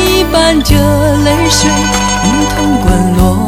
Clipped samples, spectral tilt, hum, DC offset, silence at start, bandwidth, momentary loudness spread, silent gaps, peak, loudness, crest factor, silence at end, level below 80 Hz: 0.4%; -4.5 dB/octave; none; under 0.1%; 0 s; 16.5 kHz; 2 LU; none; 0 dBFS; -9 LUFS; 8 dB; 0 s; -18 dBFS